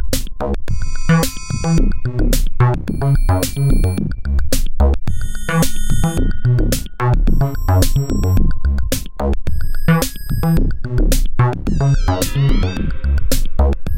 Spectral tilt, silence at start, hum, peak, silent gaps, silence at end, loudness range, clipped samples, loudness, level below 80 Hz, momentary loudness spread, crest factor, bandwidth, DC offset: -6 dB/octave; 0 s; none; 0 dBFS; none; 0 s; 1 LU; under 0.1%; -18 LUFS; -18 dBFS; 6 LU; 14 dB; 17 kHz; 5%